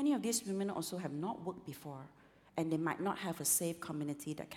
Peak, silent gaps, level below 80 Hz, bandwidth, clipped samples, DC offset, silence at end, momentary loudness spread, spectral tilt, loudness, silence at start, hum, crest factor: -22 dBFS; none; -76 dBFS; 18.5 kHz; under 0.1%; under 0.1%; 0 s; 15 LU; -4 dB/octave; -38 LUFS; 0 s; none; 16 dB